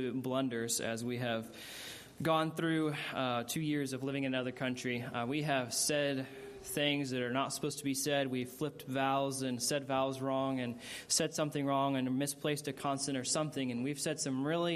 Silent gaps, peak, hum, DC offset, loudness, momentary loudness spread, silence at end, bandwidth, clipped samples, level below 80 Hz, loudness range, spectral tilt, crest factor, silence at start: none; -16 dBFS; none; under 0.1%; -35 LUFS; 6 LU; 0 s; 15 kHz; under 0.1%; -74 dBFS; 1 LU; -4 dB/octave; 18 dB; 0 s